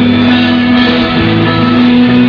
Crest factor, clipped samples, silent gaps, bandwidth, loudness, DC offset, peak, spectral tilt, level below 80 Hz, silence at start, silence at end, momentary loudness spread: 8 dB; 0.6%; none; 5.4 kHz; -8 LUFS; under 0.1%; 0 dBFS; -7.5 dB/octave; -32 dBFS; 0 s; 0 s; 2 LU